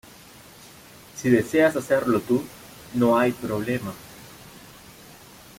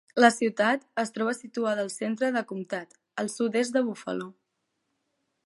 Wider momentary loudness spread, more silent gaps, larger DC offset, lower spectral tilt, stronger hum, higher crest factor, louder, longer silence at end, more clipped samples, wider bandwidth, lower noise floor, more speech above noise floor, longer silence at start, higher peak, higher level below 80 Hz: first, 25 LU vs 14 LU; neither; neither; first, -6 dB/octave vs -4 dB/octave; neither; about the same, 20 dB vs 24 dB; first, -23 LUFS vs -28 LUFS; second, 1 s vs 1.15 s; neither; first, 16.5 kHz vs 11.5 kHz; second, -47 dBFS vs -79 dBFS; second, 26 dB vs 52 dB; first, 0.65 s vs 0.15 s; about the same, -6 dBFS vs -4 dBFS; first, -58 dBFS vs -82 dBFS